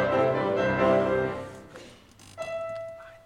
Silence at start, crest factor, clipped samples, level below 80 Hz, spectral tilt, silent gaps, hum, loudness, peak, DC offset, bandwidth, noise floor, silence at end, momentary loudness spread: 0 s; 18 dB; under 0.1%; -54 dBFS; -6.5 dB/octave; none; none; -26 LUFS; -10 dBFS; under 0.1%; 11.5 kHz; -51 dBFS; 0.1 s; 21 LU